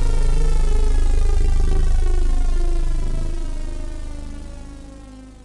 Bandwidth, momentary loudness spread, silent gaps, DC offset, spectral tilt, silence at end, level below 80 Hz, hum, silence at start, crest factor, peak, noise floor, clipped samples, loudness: 10.5 kHz; 16 LU; none; under 0.1%; -6 dB/octave; 0.15 s; -18 dBFS; none; 0 s; 8 dB; -8 dBFS; -39 dBFS; under 0.1%; -24 LUFS